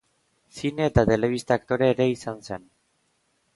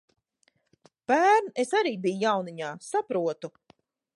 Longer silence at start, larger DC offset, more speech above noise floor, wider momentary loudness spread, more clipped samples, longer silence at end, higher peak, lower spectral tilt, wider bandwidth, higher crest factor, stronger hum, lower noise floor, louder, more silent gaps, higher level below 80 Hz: second, 0.55 s vs 1.1 s; neither; about the same, 46 dB vs 45 dB; about the same, 16 LU vs 16 LU; neither; first, 1 s vs 0.65 s; first, -6 dBFS vs -10 dBFS; first, -6.5 dB/octave vs -4.5 dB/octave; about the same, 11.5 kHz vs 11.5 kHz; about the same, 20 dB vs 18 dB; neither; about the same, -70 dBFS vs -71 dBFS; about the same, -24 LUFS vs -26 LUFS; neither; first, -44 dBFS vs -82 dBFS